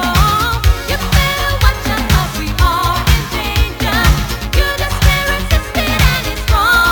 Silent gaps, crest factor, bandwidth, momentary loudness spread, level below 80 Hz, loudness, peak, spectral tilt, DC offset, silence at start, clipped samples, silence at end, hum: none; 12 dB; over 20 kHz; 5 LU; -16 dBFS; -14 LUFS; 0 dBFS; -4 dB/octave; under 0.1%; 0 s; under 0.1%; 0 s; none